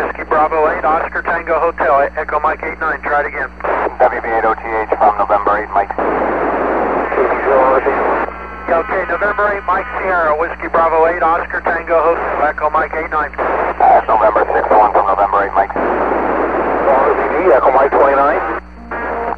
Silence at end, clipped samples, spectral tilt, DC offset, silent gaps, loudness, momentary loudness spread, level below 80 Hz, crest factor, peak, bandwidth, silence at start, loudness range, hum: 0 s; under 0.1%; -7.5 dB/octave; 0.7%; none; -14 LUFS; 7 LU; -36 dBFS; 14 dB; 0 dBFS; 6.2 kHz; 0 s; 3 LU; none